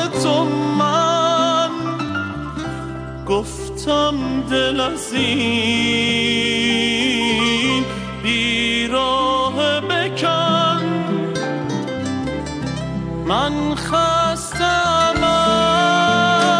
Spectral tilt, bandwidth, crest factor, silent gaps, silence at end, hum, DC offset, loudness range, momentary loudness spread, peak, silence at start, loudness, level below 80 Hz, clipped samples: -4 dB/octave; 13.5 kHz; 12 dB; none; 0 s; none; under 0.1%; 4 LU; 10 LU; -6 dBFS; 0 s; -18 LUFS; -40 dBFS; under 0.1%